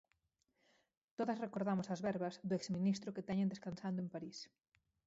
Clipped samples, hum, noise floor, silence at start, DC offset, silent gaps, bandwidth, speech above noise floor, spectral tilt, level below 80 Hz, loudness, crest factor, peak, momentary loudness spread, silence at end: under 0.1%; none; -84 dBFS; 1.2 s; under 0.1%; none; 7.6 kHz; 43 dB; -6.5 dB/octave; -78 dBFS; -41 LUFS; 16 dB; -26 dBFS; 11 LU; 0.6 s